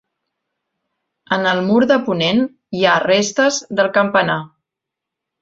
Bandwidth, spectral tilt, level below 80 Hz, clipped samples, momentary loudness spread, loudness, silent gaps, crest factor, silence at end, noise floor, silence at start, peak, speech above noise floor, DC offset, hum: 7.8 kHz; -4 dB/octave; -60 dBFS; under 0.1%; 6 LU; -16 LUFS; none; 16 dB; 0.95 s; -83 dBFS; 1.3 s; -2 dBFS; 67 dB; under 0.1%; none